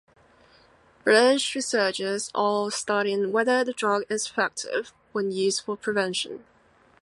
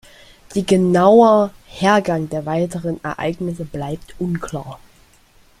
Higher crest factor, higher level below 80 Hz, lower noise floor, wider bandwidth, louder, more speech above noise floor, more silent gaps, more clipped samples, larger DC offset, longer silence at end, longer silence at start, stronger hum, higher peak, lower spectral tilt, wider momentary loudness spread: about the same, 20 dB vs 18 dB; second, -72 dBFS vs -48 dBFS; first, -59 dBFS vs -51 dBFS; second, 11.5 kHz vs 14.5 kHz; second, -25 LUFS vs -18 LUFS; about the same, 35 dB vs 35 dB; neither; neither; neither; second, 0.65 s vs 0.85 s; first, 1.05 s vs 0.5 s; neither; second, -6 dBFS vs -2 dBFS; second, -2.5 dB/octave vs -6.5 dB/octave; second, 9 LU vs 16 LU